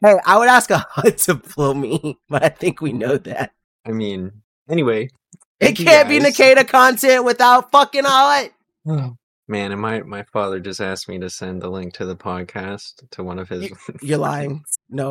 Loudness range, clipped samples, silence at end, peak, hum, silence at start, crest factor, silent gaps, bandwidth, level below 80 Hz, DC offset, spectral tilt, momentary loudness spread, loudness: 15 LU; under 0.1%; 0 s; 0 dBFS; none; 0 s; 16 dB; 3.64-3.84 s, 4.44-4.66 s, 5.45-5.59 s, 9.23-9.43 s; 16.5 kHz; -56 dBFS; under 0.1%; -4 dB/octave; 19 LU; -15 LUFS